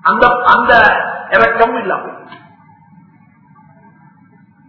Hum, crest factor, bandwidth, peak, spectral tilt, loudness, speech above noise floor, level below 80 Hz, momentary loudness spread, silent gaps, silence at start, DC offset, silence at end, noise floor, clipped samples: none; 14 dB; 6 kHz; 0 dBFS; -6 dB/octave; -11 LUFS; 36 dB; -44 dBFS; 12 LU; none; 0.05 s; under 0.1%; 2.3 s; -46 dBFS; 0.2%